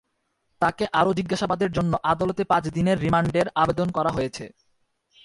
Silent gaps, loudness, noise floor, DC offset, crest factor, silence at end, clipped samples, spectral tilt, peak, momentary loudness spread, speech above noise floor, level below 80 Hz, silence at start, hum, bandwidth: none; -23 LUFS; -73 dBFS; under 0.1%; 18 dB; 0.75 s; under 0.1%; -6.5 dB/octave; -6 dBFS; 4 LU; 51 dB; -50 dBFS; 0.6 s; none; 11.5 kHz